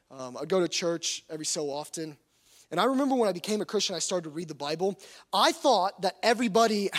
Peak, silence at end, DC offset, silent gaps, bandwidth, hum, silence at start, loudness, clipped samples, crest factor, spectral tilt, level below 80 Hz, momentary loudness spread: -8 dBFS; 0 s; under 0.1%; none; 16 kHz; none; 0.1 s; -28 LUFS; under 0.1%; 20 dB; -3 dB/octave; -76 dBFS; 13 LU